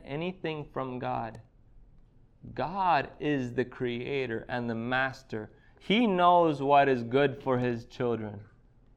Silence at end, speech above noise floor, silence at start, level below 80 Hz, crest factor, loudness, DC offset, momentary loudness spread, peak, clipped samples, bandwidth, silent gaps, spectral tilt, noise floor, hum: 0.5 s; 29 dB; 0.05 s; -58 dBFS; 20 dB; -29 LUFS; under 0.1%; 16 LU; -10 dBFS; under 0.1%; 9 kHz; none; -7 dB/octave; -57 dBFS; none